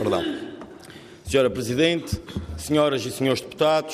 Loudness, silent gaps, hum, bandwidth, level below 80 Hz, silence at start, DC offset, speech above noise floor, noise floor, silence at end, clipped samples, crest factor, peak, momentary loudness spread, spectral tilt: -23 LUFS; none; none; 15.5 kHz; -48 dBFS; 0 s; under 0.1%; 21 dB; -44 dBFS; 0 s; under 0.1%; 16 dB; -8 dBFS; 19 LU; -5 dB/octave